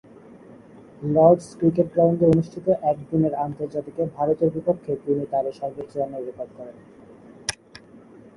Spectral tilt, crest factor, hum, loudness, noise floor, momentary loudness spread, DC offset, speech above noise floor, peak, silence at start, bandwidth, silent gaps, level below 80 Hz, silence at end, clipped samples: -7.5 dB/octave; 22 dB; none; -23 LUFS; -47 dBFS; 16 LU; under 0.1%; 25 dB; -2 dBFS; 0.5 s; 11.5 kHz; none; -56 dBFS; 0.85 s; under 0.1%